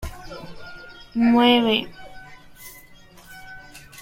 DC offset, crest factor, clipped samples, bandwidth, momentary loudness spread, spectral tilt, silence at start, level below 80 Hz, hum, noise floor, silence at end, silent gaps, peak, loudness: under 0.1%; 22 dB; under 0.1%; 16.5 kHz; 26 LU; -5 dB/octave; 0 s; -46 dBFS; none; -47 dBFS; 0.25 s; none; -2 dBFS; -18 LUFS